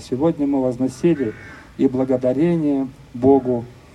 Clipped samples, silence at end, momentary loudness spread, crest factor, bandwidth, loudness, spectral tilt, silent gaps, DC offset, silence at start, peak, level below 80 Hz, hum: under 0.1%; 0.2 s; 10 LU; 16 dB; 11 kHz; -20 LUFS; -8.5 dB/octave; none; under 0.1%; 0 s; -4 dBFS; -50 dBFS; none